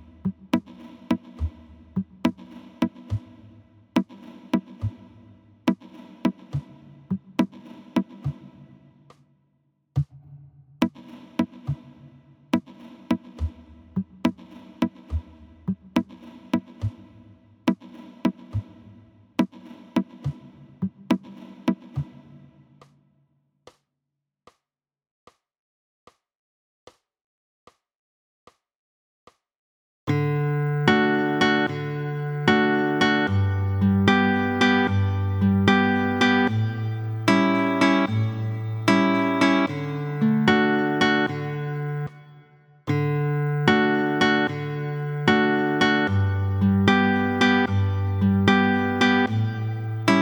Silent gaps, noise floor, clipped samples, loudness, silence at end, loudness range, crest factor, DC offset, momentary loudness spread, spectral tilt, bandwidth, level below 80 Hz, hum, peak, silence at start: 25.11-25.27 s, 25.59-26.07 s, 26.36-26.87 s, 27.21-27.67 s, 27.96-28.47 s, 28.76-29.27 s, 29.56-30.07 s; -87 dBFS; under 0.1%; -23 LUFS; 0 s; 12 LU; 22 dB; under 0.1%; 14 LU; -6.5 dB/octave; 19.5 kHz; -48 dBFS; none; -4 dBFS; 0.25 s